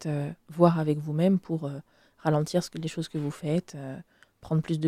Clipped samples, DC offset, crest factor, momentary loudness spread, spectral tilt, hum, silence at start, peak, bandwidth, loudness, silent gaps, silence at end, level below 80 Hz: under 0.1%; under 0.1%; 22 dB; 16 LU; -7.5 dB/octave; none; 0 s; -6 dBFS; 13.5 kHz; -28 LUFS; none; 0 s; -64 dBFS